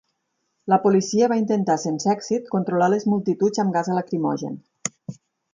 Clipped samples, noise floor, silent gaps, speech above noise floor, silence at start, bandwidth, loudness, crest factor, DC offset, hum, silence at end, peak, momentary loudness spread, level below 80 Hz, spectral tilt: under 0.1%; -74 dBFS; none; 54 dB; 0.65 s; 9.4 kHz; -22 LUFS; 18 dB; under 0.1%; none; 0.4 s; -4 dBFS; 12 LU; -70 dBFS; -6 dB/octave